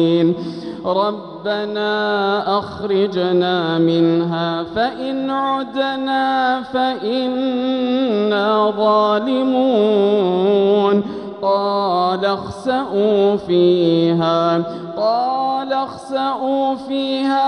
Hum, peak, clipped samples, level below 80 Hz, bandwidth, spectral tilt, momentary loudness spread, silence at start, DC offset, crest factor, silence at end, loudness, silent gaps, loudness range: none; -4 dBFS; under 0.1%; -58 dBFS; 9.8 kHz; -7 dB/octave; 7 LU; 0 s; under 0.1%; 12 dB; 0 s; -17 LUFS; none; 3 LU